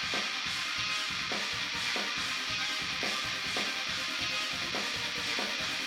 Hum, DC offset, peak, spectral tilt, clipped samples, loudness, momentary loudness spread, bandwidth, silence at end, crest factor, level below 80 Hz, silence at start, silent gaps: none; under 0.1%; -18 dBFS; -1 dB/octave; under 0.1%; -31 LUFS; 1 LU; 18 kHz; 0 s; 14 dB; -62 dBFS; 0 s; none